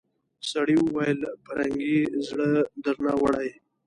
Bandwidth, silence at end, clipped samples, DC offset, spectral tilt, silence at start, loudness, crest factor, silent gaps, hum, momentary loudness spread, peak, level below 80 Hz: 11 kHz; 0.35 s; under 0.1%; under 0.1%; -6 dB/octave; 0.45 s; -26 LUFS; 14 dB; none; none; 8 LU; -12 dBFS; -60 dBFS